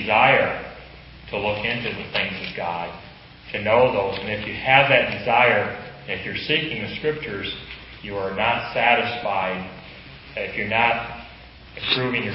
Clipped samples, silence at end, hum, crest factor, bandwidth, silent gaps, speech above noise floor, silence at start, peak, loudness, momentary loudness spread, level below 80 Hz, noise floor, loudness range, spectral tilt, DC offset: under 0.1%; 0 s; none; 22 dB; 5.8 kHz; none; 21 dB; 0 s; 0 dBFS; -21 LUFS; 20 LU; -48 dBFS; -43 dBFS; 5 LU; -9 dB/octave; under 0.1%